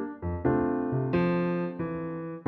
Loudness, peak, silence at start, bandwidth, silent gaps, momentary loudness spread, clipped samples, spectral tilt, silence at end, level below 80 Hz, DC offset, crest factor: -29 LUFS; -12 dBFS; 0 s; 4.7 kHz; none; 8 LU; under 0.1%; -10.5 dB/octave; 0.05 s; -50 dBFS; under 0.1%; 18 dB